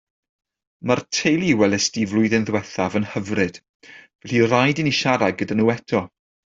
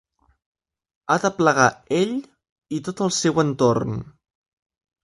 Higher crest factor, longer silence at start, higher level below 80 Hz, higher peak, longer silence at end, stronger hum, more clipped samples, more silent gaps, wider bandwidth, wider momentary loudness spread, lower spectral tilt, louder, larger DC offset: about the same, 18 dB vs 22 dB; second, 0.85 s vs 1.1 s; about the same, -58 dBFS vs -56 dBFS; about the same, -2 dBFS vs -2 dBFS; second, 0.5 s vs 0.95 s; neither; neither; first, 3.69-3.80 s, 4.15-4.19 s vs 2.52-2.56 s; second, 7.8 kHz vs 11.5 kHz; second, 7 LU vs 13 LU; about the same, -4.5 dB/octave vs -4.5 dB/octave; about the same, -20 LUFS vs -21 LUFS; neither